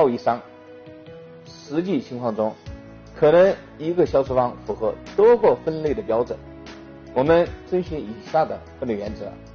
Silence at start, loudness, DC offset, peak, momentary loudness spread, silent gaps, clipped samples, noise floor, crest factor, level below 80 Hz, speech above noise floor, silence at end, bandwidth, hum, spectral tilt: 0 s; -22 LUFS; under 0.1%; -6 dBFS; 24 LU; none; under 0.1%; -42 dBFS; 16 dB; -46 dBFS; 22 dB; 0 s; 6.8 kHz; none; -6 dB/octave